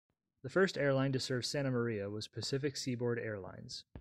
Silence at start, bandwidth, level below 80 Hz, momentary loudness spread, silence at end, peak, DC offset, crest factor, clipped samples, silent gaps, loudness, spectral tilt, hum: 0.45 s; 13 kHz; -68 dBFS; 13 LU; 0 s; -20 dBFS; under 0.1%; 16 dB; under 0.1%; none; -36 LUFS; -5 dB/octave; none